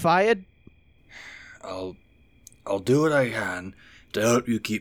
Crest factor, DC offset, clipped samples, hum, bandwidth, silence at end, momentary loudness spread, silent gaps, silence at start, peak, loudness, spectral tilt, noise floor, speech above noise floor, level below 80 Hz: 16 dB; under 0.1%; under 0.1%; none; over 20 kHz; 0 s; 22 LU; none; 0 s; -10 dBFS; -25 LUFS; -5 dB/octave; -55 dBFS; 32 dB; -60 dBFS